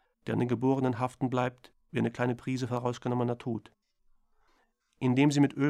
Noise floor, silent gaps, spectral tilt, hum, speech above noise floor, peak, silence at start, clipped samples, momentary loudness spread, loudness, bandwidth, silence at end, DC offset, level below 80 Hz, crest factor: -71 dBFS; none; -7 dB/octave; none; 42 dB; -14 dBFS; 0.25 s; under 0.1%; 10 LU; -30 LUFS; 11.5 kHz; 0 s; under 0.1%; -66 dBFS; 18 dB